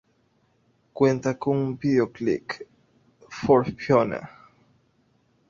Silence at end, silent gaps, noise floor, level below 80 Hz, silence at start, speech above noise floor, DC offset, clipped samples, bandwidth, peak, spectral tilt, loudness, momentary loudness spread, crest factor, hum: 1.2 s; none; -66 dBFS; -58 dBFS; 0.95 s; 43 dB; under 0.1%; under 0.1%; 7.4 kHz; -4 dBFS; -7.5 dB/octave; -24 LUFS; 16 LU; 22 dB; none